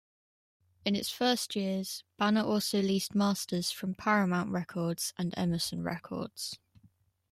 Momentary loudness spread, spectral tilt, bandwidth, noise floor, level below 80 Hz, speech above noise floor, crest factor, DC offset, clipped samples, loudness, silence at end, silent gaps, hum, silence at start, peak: 10 LU; -4.5 dB/octave; 15.5 kHz; -66 dBFS; -68 dBFS; 35 dB; 20 dB; under 0.1%; under 0.1%; -32 LUFS; 0.75 s; none; none; 0.85 s; -12 dBFS